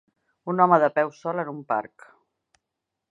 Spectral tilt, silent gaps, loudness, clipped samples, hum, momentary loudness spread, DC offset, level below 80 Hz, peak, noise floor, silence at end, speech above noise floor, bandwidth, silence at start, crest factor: -8 dB/octave; none; -23 LUFS; under 0.1%; none; 15 LU; under 0.1%; -80 dBFS; -4 dBFS; -84 dBFS; 1.25 s; 61 dB; 7.6 kHz; 0.45 s; 22 dB